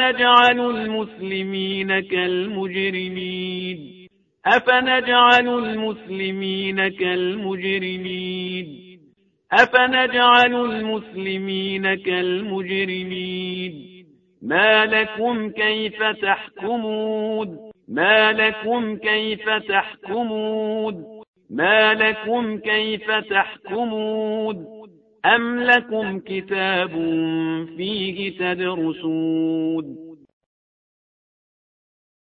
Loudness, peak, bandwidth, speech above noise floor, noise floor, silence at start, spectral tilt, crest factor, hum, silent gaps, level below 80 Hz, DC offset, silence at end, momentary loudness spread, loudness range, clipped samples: -20 LUFS; 0 dBFS; 7.6 kHz; 38 dB; -58 dBFS; 0 s; -6 dB/octave; 22 dB; none; 21.28-21.34 s; -62 dBFS; under 0.1%; 2.1 s; 13 LU; 6 LU; under 0.1%